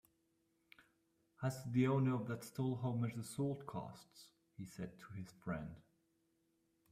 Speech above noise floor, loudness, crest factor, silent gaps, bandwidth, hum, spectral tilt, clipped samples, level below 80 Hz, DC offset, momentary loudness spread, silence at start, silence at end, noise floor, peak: 40 dB; -42 LUFS; 20 dB; none; 15 kHz; none; -7.5 dB/octave; under 0.1%; -74 dBFS; under 0.1%; 20 LU; 1.4 s; 1.1 s; -81 dBFS; -24 dBFS